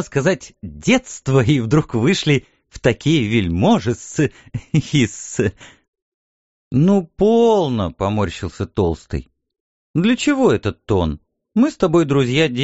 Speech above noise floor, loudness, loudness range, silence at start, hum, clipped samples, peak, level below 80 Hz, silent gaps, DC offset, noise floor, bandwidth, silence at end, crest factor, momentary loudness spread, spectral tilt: over 73 dB; -18 LUFS; 3 LU; 0 s; none; under 0.1%; 0 dBFS; -40 dBFS; 5.88-5.93 s, 6.02-6.71 s, 9.60-9.94 s; 0.2%; under -90 dBFS; 8 kHz; 0 s; 18 dB; 9 LU; -6 dB/octave